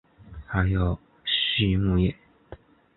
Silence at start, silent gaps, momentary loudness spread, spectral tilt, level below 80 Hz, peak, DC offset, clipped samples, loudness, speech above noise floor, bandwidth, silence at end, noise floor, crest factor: 0.25 s; none; 9 LU; -10.5 dB/octave; -36 dBFS; -8 dBFS; under 0.1%; under 0.1%; -25 LUFS; 25 dB; 4.3 kHz; 0.4 s; -48 dBFS; 18 dB